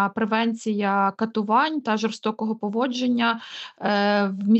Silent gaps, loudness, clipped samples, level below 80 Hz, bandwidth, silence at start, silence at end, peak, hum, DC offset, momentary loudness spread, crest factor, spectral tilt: none; -23 LUFS; under 0.1%; -78 dBFS; 8.2 kHz; 0 s; 0 s; -8 dBFS; none; under 0.1%; 6 LU; 14 dB; -5.5 dB/octave